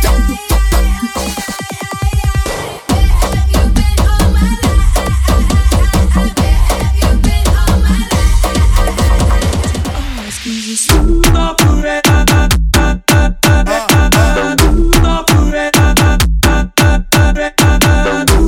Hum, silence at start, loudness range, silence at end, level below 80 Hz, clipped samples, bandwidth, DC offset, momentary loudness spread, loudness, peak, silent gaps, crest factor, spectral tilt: none; 0 s; 3 LU; 0 s; -12 dBFS; under 0.1%; 17.5 kHz; under 0.1%; 7 LU; -12 LUFS; 0 dBFS; none; 10 dB; -4.5 dB/octave